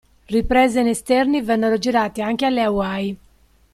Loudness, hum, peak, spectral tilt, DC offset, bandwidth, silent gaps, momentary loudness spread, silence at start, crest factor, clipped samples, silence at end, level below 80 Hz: -19 LUFS; none; -4 dBFS; -5 dB/octave; under 0.1%; 14.5 kHz; none; 8 LU; 0.3 s; 16 dB; under 0.1%; 0.6 s; -40 dBFS